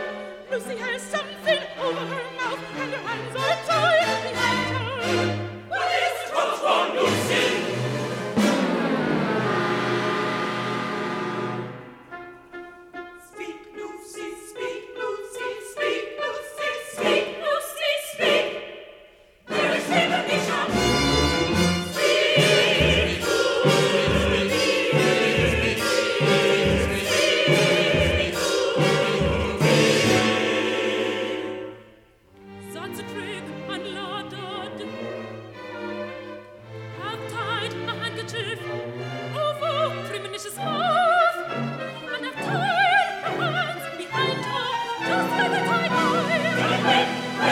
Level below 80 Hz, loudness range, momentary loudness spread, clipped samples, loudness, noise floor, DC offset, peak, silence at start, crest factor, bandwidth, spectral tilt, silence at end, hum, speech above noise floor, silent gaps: -44 dBFS; 13 LU; 16 LU; under 0.1%; -23 LUFS; -53 dBFS; under 0.1%; -6 dBFS; 0 s; 18 dB; 17 kHz; -4 dB/octave; 0 s; none; 27 dB; none